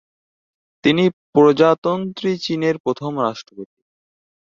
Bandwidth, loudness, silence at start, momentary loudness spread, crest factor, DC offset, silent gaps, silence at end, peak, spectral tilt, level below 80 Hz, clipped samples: 7.4 kHz; -18 LUFS; 0.85 s; 10 LU; 18 dB; under 0.1%; 1.13-1.33 s, 1.78-1.82 s, 2.80-2.84 s; 0.85 s; -2 dBFS; -6.5 dB/octave; -62 dBFS; under 0.1%